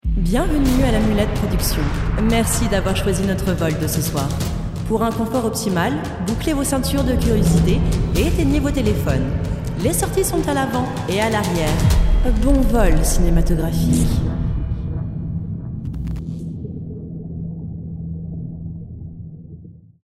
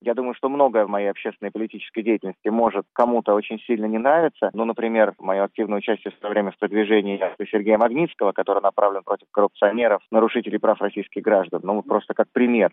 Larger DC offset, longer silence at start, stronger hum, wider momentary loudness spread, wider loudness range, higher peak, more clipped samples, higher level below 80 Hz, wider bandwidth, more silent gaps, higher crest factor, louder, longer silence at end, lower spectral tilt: neither; about the same, 0.05 s vs 0.05 s; neither; first, 13 LU vs 8 LU; first, 11 LU vs 2 LU; about the same, -2 dBFS vs -4 dBFS; neither; first, -24 dBFS vs -72 dBFS; first, 16 kHz vs 3.9 kHz; neither; about the same, 16 dB vs 18 dB; about the same, -20 LUFS vs -22 LUFS; first, 0.35 s vs 0.05 s; second, -5.5 dB/octave vs -9 dB/octave